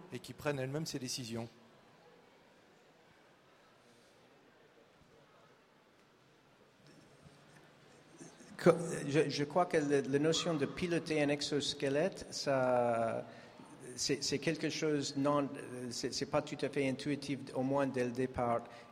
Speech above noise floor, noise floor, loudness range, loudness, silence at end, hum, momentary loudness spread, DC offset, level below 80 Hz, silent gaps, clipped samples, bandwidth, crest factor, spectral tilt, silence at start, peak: 31 dB; -66 dBFS; 10 LU; -35 LUFS; 0 s; none; 13 LU; under 0.1%; -70 dBFS; none; under 0.1%; 16 kHz; 24 dB; -4.5 dB/octave; 0 s; -14 dBFS